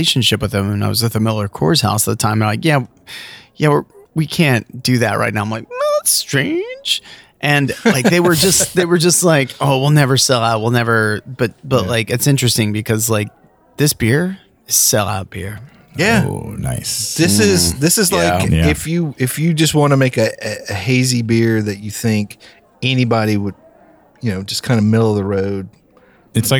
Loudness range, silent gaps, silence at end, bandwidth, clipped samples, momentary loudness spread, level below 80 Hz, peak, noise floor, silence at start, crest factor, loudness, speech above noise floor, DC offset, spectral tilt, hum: 5 LU; none; 0 s; over 20 kHz; under 0.1%; 11 LU; -40 dBFS; -2 dBFS; -49 dBFS; 0 s; 14 dB; -15 LUFS; 34 dB; under 0.1%; -4 dB/octave; none